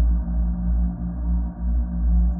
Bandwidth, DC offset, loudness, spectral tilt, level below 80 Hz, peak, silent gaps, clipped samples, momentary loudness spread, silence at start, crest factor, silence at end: 1.7 kHz; under 0.1%; -25 LUFS; -14.5 dB/octave; -22 dBFS; -12 dBFS; none; under 0.1%; 3 LU; 0 s; 10 dB; 0 s